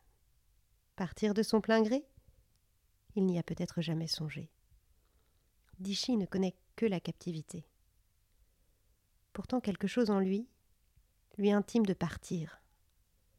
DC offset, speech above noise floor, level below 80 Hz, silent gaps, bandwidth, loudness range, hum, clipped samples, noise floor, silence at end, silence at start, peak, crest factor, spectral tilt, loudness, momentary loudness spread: under 0.1%; 39 dB; -64 dBFS; none; 15 kHz; 5 LU; none; under 0.1%; -73 dBFS; 0.85 s; 1 s; -18 dBFS; 18 dB; -6 dB/octave; -34 LUFS; 17 LU